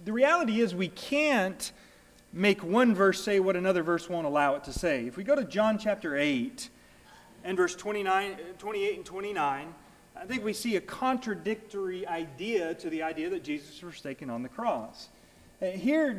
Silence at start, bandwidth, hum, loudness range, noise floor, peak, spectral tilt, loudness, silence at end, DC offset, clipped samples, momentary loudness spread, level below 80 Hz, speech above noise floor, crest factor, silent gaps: 0 s; 16 kHz; none; 7 LU; -55 dBFS; -12 dBFS; -5 dB/octave; -29 LUFS; 0 s; under 0.1%; under 0.1%; 14 LU; -58 dBFS; 26 dB; 18 dB; none